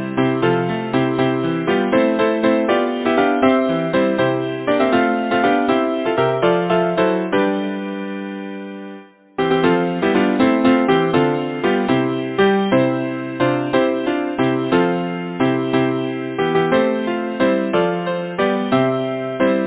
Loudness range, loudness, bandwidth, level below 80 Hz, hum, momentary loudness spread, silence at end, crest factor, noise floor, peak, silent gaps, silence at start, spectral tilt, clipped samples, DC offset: 3 LU; -18 LUFS; 4 kHz; -54 dBFS; none; 7 LU; 0 s; 16 dB; -38 dBFS; -2 dBFS; none; 0 s; -10.5 dB/octave; under 0.1%; under 0.1%